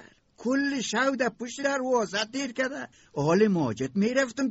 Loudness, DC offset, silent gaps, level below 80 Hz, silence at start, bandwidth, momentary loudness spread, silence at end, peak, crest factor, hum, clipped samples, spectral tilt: -27 LUFS; under 0.1%; none; -66 dBFS; 0 s; 8 kHz; 8 LU; 0 s; -10 dBFS; 16 dB; none; under 0.1%; -4 dB/octave